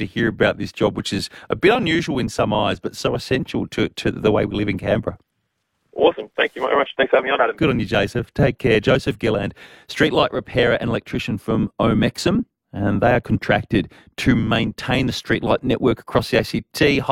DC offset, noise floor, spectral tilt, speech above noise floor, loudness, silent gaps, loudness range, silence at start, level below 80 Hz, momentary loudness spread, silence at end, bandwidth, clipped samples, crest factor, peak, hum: under 0.1%; -73 dBFS; -6 dB/octave; 53 dB; -20 LUFS; none; 3 LU; 0 s; -42 dBFS; 7 LU; 0 s; 16.5 kHz; under 0.1%; 18 dB; -2 dBFS; none